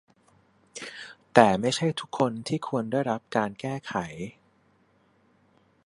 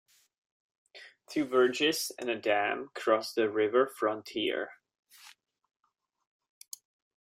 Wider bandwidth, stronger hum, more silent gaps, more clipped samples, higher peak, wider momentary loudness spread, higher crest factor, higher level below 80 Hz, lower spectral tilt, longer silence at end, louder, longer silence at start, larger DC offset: second, 11.5 kHz vs 16 kHz; neither; second, none vs 4.99-5.03 s; neither; first, 0 dBFS vs -12 dBFS; about the same, 20 LU vs 20 LU; first, 28 dB vs 20 dB; first, -64 dBFS vs -80 dBFS; first, -5.5 dB/octave vs -3 dB/octave; second, 1.55 s vs 1.9 s; first, -26 LUFS vs -30 LUFS; second, 0.75 s vs 0.95 s; neither